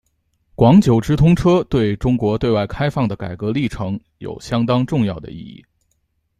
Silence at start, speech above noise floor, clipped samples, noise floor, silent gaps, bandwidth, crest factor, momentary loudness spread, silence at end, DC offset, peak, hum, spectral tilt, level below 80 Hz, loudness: 0.6 s; 51 dB; under 0.1%; -67 dBFS; none; 13 kHz; 16 dB; 16 LU; 0.9 s; under 0.1%; -2 dBFS; none; -8 dB/octave; -36 dBFS; -17 LUFS